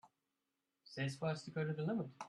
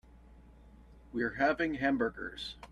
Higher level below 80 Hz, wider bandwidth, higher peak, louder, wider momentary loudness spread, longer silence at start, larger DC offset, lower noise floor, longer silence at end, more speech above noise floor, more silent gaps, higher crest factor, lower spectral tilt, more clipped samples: second, -80 dBFS vs -56 dBFS; about the same, 11.5 kHz vs 11 kHz; second, -28 dBFS vs -16 dBFS; second, -42 LUFS vs -33 LUFS; second, 4 LU vs 12 LU; about the same, 0.05 s vs 0.15 s; neither; first, -89 dBFS vs -56 dBFS; about the same, 0 s vs 0 s; first, 48 dB vs 24 dB; neither; about the same, 14 dB vs 18 dB; about the same, -6.5 dB/octave vs -6 dB/octave; neither